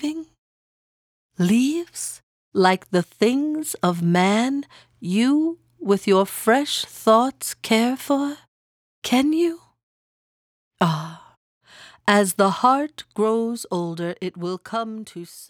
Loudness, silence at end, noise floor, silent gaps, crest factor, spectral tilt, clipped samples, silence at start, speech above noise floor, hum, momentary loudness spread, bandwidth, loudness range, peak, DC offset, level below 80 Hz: -21 LUFS; 0.05 s; under -90 dBFS; 0.38-1.29 s, 2.23-2.52 s, 8.48-9.02 s, 9.83-10.71 s, 11.37-11.61 s; 20 dB; -5 dB/octave; under 0.1%; 0 s; over 69 dB; none; 13 LU; 19 kHz; 4 LU; -2 dBFS; under 0.1%; -68 dBFS